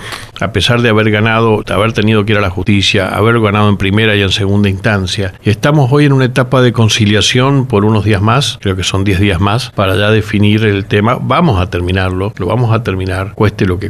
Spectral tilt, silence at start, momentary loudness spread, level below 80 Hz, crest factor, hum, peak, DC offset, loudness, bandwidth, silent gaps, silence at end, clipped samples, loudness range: -5.5 dB/octave; 0 s; 5 LU; -34 dBFS; 10 dB; none; 0 dBFS; under 0.1%; -11 LUFS; 13.5 kHz; none; 0 s; under 0.1%; 2 LU